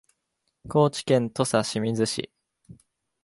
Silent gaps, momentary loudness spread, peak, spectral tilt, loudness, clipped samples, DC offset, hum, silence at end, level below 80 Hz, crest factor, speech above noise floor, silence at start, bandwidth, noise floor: none; 6 LU; -6 dBFS; -5 dB/octave; -25 LUFS; under 0.1%; under 0.1%; none; 0.5 s; -62 dBFS; 20 dB; 54 dB; 0.65 s; 11.5 kHz; -78 dBFS